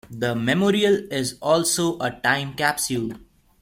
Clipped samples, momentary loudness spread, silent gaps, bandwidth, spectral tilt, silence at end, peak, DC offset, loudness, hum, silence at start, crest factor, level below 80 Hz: under 0.1%; 8 LU; none; 16.5 kHz; -4 dB/octave; 0.45 s; -4 dBFS; under 0.1%; -22 LUFS; none; 0.1 s; 18 dB; -56 dBFS